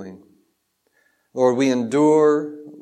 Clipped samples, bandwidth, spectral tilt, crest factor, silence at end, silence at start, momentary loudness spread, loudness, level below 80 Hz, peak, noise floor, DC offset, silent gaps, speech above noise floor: under 0.1%; 10 kHz; -6 dB/octave; 16 dB; 0 s; 0 s; 19 LU; -18 LUFS; -78 dBFS; -6 dBFS; -69 dBFS; under 0.1%; none; 52 dB